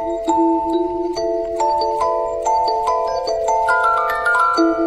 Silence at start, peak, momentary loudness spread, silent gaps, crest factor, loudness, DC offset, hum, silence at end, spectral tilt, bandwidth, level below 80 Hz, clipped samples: 0 s; -4 dBFS; 5 LU; none; 12 dB; -18 LUFS; under 0.1%; none; 0 s; -3.5 dB/octave; 12.5 kHz; -44 dBFS; under 0.1%